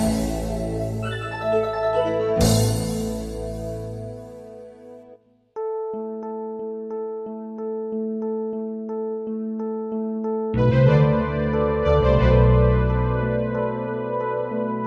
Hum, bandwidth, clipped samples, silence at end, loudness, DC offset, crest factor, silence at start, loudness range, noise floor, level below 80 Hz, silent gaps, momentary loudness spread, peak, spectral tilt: none; 14 kHz; under 0.1%; 0 s; -23 LUFS; under 0.1%; 18 dB; 0 s; 13 LU; -51 dBFS; -32 dBFS; none; 15 LU; -6 dBFS; -7 dB/octave